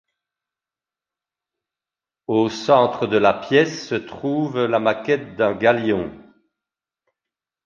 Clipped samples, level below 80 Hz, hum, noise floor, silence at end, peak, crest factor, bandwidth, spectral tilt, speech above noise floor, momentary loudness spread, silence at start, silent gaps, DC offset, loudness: under 0.1%; -58 dBFS; none; -90 dBFS; 1.45 s; -2 dBFS; 20 dB; 7.4 kHz; -6 dB/octave; 71 dB; 9 LU; 2.3 s; none; under 0.1%; -20 LUFS